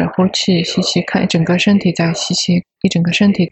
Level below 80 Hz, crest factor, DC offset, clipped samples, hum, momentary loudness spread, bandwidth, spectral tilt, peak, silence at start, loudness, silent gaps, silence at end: -48 dBFS; 14 dB; under 0.1%; under 0.1%; none; 4 LU; 8.4 kHz; -5 dB/octave; 0 dBFS; 0 s; -14 LUFS; none; 0.05 s